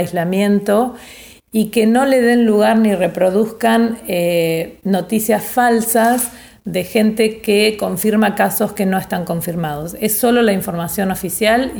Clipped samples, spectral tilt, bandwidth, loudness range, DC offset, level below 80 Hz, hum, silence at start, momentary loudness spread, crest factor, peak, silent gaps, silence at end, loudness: under 0.1%; -5 dB/octave; over 20 kHz; 2 LU; under 0.1%; -48 dBFS; none; 0 s; 9 LU; 14 dB; -2 dBFS; none; 0 s; -16 LUFS